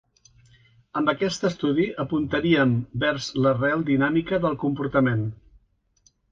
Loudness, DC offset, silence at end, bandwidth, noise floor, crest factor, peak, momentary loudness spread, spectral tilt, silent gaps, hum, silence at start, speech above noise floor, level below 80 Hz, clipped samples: -23 LUFS; under 0.1%; 0.95 s; 7.8 kHz; -64 dBFS; 18 dB; -8 dBFS; 5 LU; -6.5 dB/octave; none; none; 0.95 s; 41 dB; -52 dBFS; under 0.1%